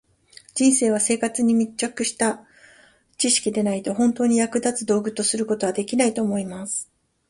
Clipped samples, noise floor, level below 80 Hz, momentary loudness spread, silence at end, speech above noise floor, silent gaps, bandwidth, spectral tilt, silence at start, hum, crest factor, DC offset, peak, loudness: under 0.1%; -55 dBFS; -62 dBFS; 9 LU; 0.45 s; 33 dB; none; 11.5 kHz; -3.5 dB/octave; 0.55 s; none; 18 dB; under 0.1%; -6 dBFS; -22 LUFS